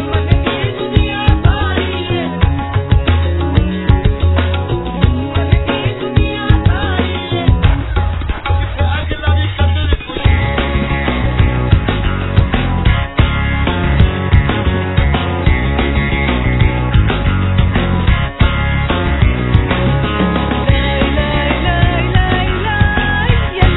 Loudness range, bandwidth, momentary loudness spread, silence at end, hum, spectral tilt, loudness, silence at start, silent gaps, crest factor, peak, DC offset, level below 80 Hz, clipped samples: 1 LU; 4.1 kHz; 4 LU; 0 s; none; -10 dB/octave; -14 LUFS; 0 s; none; 12 dB; 0 dBFS; 0.5%; -18 dBFS; 0.3%